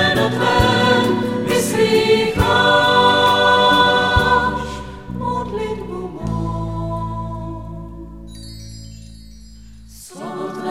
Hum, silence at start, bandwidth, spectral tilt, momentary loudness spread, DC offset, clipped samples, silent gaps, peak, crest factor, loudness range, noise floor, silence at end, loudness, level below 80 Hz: none; 0 s; 16 kHz; -4.5 dB/octave; 22 LU; 0.3%; under 0.1%; none; -2 dBFS; 16 dB; 18 LU; -40 dBFS; 0 s; -16 LUFS; -34 dBFS